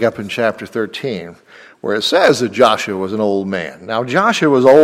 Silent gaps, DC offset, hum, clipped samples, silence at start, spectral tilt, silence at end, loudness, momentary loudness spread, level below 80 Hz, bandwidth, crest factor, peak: none; under 0.1%; none; under 0.1%; 0 s; -4.5 dB/octave; 0 s; -15 LUFS; 11 LU; -58 dBFS; 15.5 kHz; 14 dB; 0 dBFS